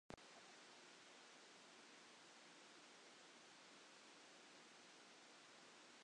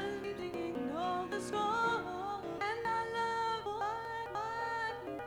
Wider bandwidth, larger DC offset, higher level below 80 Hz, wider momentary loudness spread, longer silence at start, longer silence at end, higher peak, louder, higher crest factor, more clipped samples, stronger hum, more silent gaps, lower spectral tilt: second, 10 kHz vs over 20 kHz; neither; second, -88 dBFS vs -66 dBFS; second, 1 LU vs 6 LU; about the same, 0.1 s vs 0 s; about the same, 0 s vs 0 s; second, -38 dBFS vs -22 dBFS; second, -63 LUFS vs -37 LUFS; first, 28 dB vs 14 dB; neither; neither; neither; second, -1.5 dB/octave vs -4.5 dB/octave